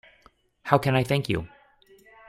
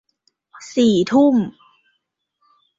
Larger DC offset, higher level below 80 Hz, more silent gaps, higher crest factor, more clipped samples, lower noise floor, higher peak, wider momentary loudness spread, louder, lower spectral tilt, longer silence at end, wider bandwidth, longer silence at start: neither; first, -54 dBFS vs -60 dBFS; neither; first, 24 dB vs 16 dB; neither; second, -60 dBFS vs -73 dBFS; about the same, -2 dBFS vs -4 dBFS; first, 18 LU vs 15 LU; second, -25 LUFS vs -17 LUFS; about the same, -6.5 dB/octave vs -6 dB/octave; second, 0.8 s vs 1.3 s; first, 15.5 kHz vs 7.8 kHz; about the same, 0.65 s vs 0.6 s